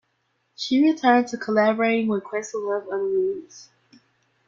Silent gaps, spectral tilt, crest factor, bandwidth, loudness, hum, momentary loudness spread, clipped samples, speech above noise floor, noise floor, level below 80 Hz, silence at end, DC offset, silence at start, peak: none; -5 dB/octave; 18 dB; 7.6 kHz; -22 LUFS; none; 9 LU; under 0.1%; 49 dB; -71 dBFS; -70 dBFS; 0.85 s; under 0.1%; 0.6 s; -4 dBFS